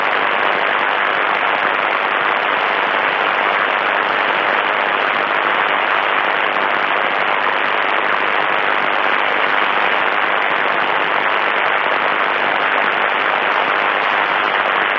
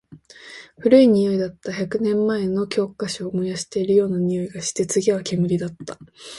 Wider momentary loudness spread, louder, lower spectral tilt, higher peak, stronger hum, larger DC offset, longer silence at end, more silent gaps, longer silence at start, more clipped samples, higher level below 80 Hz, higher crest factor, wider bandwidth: second, 1 LU vs 17 LU; first, -15 LUFS vs -21 LUFS; second, -4 dB/octave vs -5.5 dB/octave; about the same, -2 dBFS vs -2 dBFS; neither; neither; about the same, 0 s vs 0 s; neither; about the same, 0 s vs 0.1 s; neither; second, -68 dBFS vs -58 dBFS; about the same, 14 dB vs 18 dB; second, 7.8 kHz vs 11.5 kHz